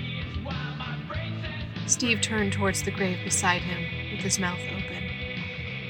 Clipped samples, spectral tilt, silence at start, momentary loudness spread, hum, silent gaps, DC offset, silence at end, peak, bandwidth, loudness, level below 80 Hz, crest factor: under 0.1%; -3.5 dB/octave; 0 s; 10 LU; none; none; under 0.1%; 0 s; -6 dBFS; 17 kHz; -28 LUFS; -46 dBFS; 22 dB